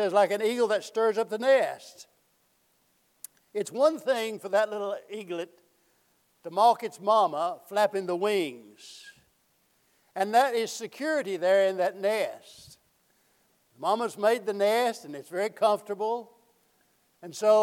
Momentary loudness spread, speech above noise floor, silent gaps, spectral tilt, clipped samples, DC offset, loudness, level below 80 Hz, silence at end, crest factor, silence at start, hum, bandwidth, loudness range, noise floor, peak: 19 LU; 43 dB; none; -3.5 dB/octave; under 0.1%; under 0.1%; -27 LUFS; -84 dBFS; 0 s; 18 dB; 0 s; none; 16.5 kHz; 3 LU; -69 dBFS; -10 dBFS